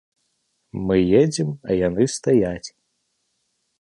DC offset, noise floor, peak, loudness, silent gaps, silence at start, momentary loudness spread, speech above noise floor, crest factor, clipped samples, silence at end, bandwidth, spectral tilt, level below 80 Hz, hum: under 0.1%; -72 dBFS; -4 dBFS; -20 LUFS; none; 0.75 s; 16 LU; 53 dB; 18 dB; under 0.1%; 1.15 s; 11.5 kHz; -6 dB/octave; -48 dBFS; none